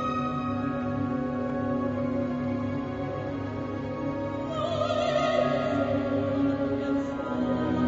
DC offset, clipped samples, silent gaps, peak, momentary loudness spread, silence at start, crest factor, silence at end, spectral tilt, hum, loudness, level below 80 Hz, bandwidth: under 0.1%; under 0.1%; none; -12 dBFS; 7 LU; 0 s; 16 dB; 0 s; -7.5 dB/octave; none; -29 LUFS; -50 dBFS; 7.8 kHz